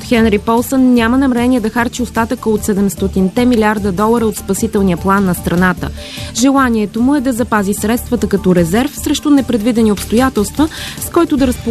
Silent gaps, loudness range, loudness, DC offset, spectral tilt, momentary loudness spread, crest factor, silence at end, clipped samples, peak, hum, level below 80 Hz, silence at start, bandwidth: none; 1 LU; -13 LUFS; 0.2%; -5.5 dB/octave; 5 LU; 12 dB; 0 s; under 0.1%; 0 dBFS; none; -30 dBFS; 0 s; 14 kHz